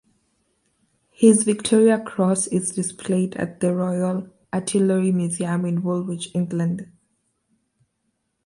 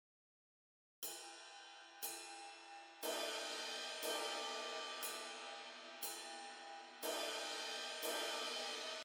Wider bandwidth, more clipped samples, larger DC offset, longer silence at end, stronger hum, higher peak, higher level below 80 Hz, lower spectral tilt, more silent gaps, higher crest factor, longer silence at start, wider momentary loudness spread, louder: second, 11.5 kHz vs over 20 kHz; neither; neither; first, 1.6 s vs 0 s; neither; first, -2 dBFS vs -30 dBFS; first, -64 dBFS vs under -90 dBFS; first, -6 dB/octave vs 1.5 dB/octave; neither; about the same, 20 dB vs 18 dB; first, 1.2 s vs 1 s; about the same, 10 LU vs 12 LU; first, -21 LUFS vs -45 LUFS